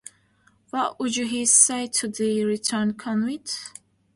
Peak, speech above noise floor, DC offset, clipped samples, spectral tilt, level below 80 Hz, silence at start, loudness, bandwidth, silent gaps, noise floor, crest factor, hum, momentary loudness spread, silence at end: -2 dBFS; 38 dB; under 0.1%; under 0.1%; -2.5 dB/octave; -68 dBFS; 0.75 s; -22 LUFS; 11.5 kHz; none; -62 dBFS; 22 dB; none; 16 LU; 0.45 s